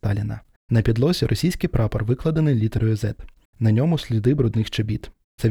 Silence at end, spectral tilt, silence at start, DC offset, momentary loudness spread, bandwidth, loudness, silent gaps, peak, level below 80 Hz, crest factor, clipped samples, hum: 0 s; -7.5 dB/octave; 0.05 s; under 0.1%; 8 LU; 15.5 kHz; -22 LUFS; 0.56-0.69 s, 3.45-3.53 s, 5.24-5.38 s; -6 dBFS; -38 dBFS; 16 dB; under 0.1%; none